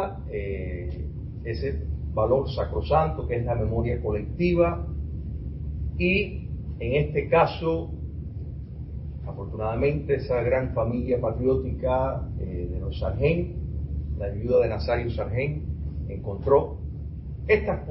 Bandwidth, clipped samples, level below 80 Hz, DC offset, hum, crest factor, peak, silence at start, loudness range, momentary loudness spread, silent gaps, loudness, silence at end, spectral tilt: 5.8 kHz; under 0.1%; -34 dBFS; under 0.1%; none; 20 dB; -6 dBFS; 0 s; 2 LU; 13 LU; none; -27 LUFS; 0 s; -11.5 dB/octave